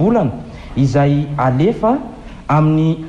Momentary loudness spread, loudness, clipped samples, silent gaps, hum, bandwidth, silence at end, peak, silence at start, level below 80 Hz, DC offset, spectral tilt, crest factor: 14 LU; -15 LUFS; under 0.1%; none; none; 7.8 kHz; 0 s; -4 dBFS; 0 s; -36 dBFS; under 0.1%; -9 dB/octave; 10 dB